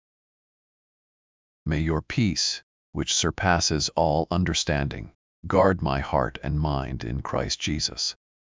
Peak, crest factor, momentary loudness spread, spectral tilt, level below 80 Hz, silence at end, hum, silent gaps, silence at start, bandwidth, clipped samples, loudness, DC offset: -6 dBFS; 20 dB; 10 LU; -4 dB/octave; -38 dBFS; 0.45 s; none; 2.63-2.93 s, 5.15-5.43 s; 1.65 s; 7.6 kHz; under 0.1%; -25 LUFS; under 0.1%